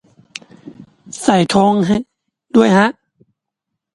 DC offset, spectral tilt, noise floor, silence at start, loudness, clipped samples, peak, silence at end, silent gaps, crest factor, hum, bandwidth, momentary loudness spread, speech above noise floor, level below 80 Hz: under 0.1%; -5.5 dB/octave; -79 dBFS; 0.65 s; -14 LUFS; under 0.1%; 0 dBFS; 1.05 s; none; 16 dB; none; 11.5 kHz; 22 LU; 67 dB; -52 dBFS